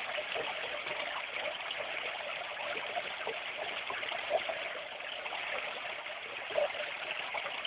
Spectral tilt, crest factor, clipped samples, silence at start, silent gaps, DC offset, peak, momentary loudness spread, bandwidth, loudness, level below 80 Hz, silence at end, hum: 2 dB/octave; 20 dB; under 0.1%; 0 s; none; under 0.1%; -18 dBFS; 5 LU; 4 kHz; -36 LUFS; -76 dBFS; 0 s; none